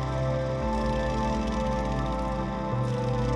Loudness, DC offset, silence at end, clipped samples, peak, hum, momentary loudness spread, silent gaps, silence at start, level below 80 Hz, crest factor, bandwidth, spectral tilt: -29 LUFS; under 0.1%; 0 s; under 0.1%; -16 dBFS; none; 2 LU; none; 0 s; -34 dBFS; 12 dB; 10.5 kHz; -7 dB/octave